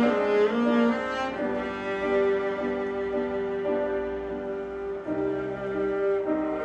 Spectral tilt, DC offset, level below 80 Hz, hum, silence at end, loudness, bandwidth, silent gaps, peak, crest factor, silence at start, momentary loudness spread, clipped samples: -6.5 dB/octave; under 0.1%; -54 dBFS; none; 0 s; -27 LUFS; 8.2 kHz; none; -12 dBFS; 14 dB; 0 s; 9 LU; under 0.1%